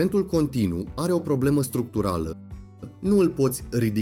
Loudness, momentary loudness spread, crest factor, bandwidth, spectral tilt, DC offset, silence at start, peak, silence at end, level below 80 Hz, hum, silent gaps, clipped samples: -24 LUFS; 15 LU; 14 dB; 17 kHz; -7 dB/octave; under 0.1%; 0 s; -10 dBFS; 0 s; -44 dBFS; none; none; under 0.1%